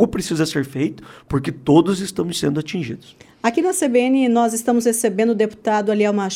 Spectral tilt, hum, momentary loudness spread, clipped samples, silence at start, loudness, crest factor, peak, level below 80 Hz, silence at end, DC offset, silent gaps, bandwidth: -5 dB/octave; none; 9 LU; under 0.1%; 0 s; -19 LUFS; 16 dB; -2 dBFS; -50 dBFS; 0 s; under 0.1%; none; 16.5 kHz